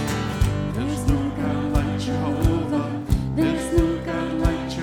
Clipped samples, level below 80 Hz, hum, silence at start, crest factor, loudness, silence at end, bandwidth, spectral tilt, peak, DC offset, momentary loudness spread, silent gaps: under 0.1%; -30 dBFS; none; 0 s; 16 dB; -23 LUFS; 0 s; 17.5 kHz; -6.5 dB/octave; -6 dBFS; under 0.1%; 4 LU; none